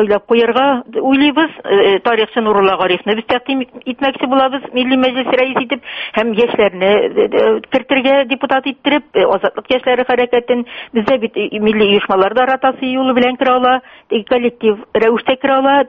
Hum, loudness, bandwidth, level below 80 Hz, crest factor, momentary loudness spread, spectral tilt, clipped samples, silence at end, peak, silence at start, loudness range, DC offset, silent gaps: none; -14 LUFS; 5.6 kHz; -52 dBFS; 14 dB; 6 LU; -2 dB/octave; under 0.1%; 0 s; 0 dBFS; 0 s; 2 LU; under 0.1%; none